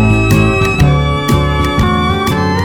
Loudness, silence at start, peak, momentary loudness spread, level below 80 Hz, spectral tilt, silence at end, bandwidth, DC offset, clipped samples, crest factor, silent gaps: -12 LUFS; 0 s; 0 dBFS; 3 LU; -20 dBFS; -6.5 dB/octave; 0 s; 18.5 kHz; under 0.1%; under 0.1%; 10 dB; none